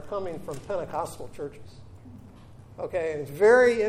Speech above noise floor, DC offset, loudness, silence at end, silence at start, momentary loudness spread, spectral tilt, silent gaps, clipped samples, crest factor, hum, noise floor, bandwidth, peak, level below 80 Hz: 23 dB; under 0.1%; -26 LUFS; 0 s; 0 s; 29 LU; -5.5 dB/octave; none; under 0.1%; 18 dB; none; -48 dBFS; 15 kHz; -8 dBFS; -56 dBFS